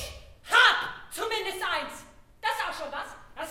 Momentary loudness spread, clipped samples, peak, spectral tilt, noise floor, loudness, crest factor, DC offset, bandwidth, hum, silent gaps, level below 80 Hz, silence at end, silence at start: 21 LU; under 0.1%; -6 dBFS; -1 dB/octave; -49 dBFS; -26 LUFS; 24 dB; under 0.1%; 16.5 kHz; none; none; -54 dBFS; 0 s; 0 s